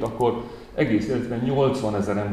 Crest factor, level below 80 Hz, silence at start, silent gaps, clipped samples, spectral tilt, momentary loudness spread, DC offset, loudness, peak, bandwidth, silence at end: 16 dB; -48 dBFS; 0 s; none; under 0.1%; -7.5 dB/octave; 5 LU; 0.1%; -24 LUFS; -8 dBFS; 13.5 kHz; 0 s